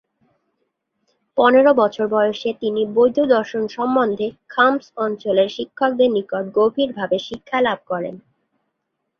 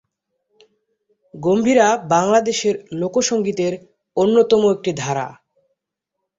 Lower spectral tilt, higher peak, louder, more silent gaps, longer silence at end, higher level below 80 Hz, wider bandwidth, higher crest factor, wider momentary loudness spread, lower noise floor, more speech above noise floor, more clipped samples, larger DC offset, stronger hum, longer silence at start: first, -6 dB/octave vs -4.5 dB/octave; about the same, -2 dBFS vs -2 dBFS; about the same, -19 LUFS vs -18 LUFS; neither; about the same, 1.05 s vs 1.05 s; about the same, -62 dBFS vs -60 dBFS; second, 6.8 kHz vs 8 kHz; about the same, 18 dB vs 18 dB; about the same, 10 LU vs 11 LU; second, -76 dBFS vs -80 dBFS; second, 58 dB vs 63 dB; neither; neither; neither; about the same, 1.35 s vs 1.35 s